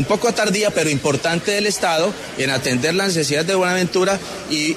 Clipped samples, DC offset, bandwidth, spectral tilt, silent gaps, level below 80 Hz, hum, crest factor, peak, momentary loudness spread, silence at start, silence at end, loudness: under 0.1%; under 0.1%; 13.5 kHz; -3.5 dB/octave; none; -52 dBFS; none; 12 dB; -6 dBFS; 3 LU; 0 s; 0 s; -18 LUFS